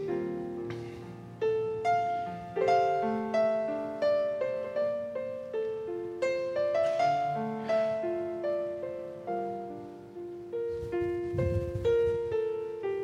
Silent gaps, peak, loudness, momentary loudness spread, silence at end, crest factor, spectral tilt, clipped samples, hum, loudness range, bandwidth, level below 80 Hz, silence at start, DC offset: none; -14 dBFS; -31 LUFS; 11 LU; 0 s; 16 dB; -7 dB/octave; under 0.1%; none; 5 LU; 10 kHz; -54 dBFS; 0 s; under 0.1%